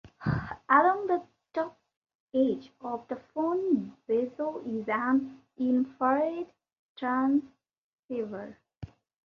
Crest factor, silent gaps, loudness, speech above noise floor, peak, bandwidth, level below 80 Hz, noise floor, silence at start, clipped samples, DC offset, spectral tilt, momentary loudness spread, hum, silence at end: 22 dB; 1.97-2.02 s, 2.15-2.27 s, 6.79-6.95 s, 7.78-8.09 s; -30 LUFS; 19 dB; -8 dBFS; 6.2 kHz; -60 dBFS; -47 dBFS; 0.05 s; under 0.1%; under 0.1%; -9 dB/octave; 14 LU; none; 0.4 s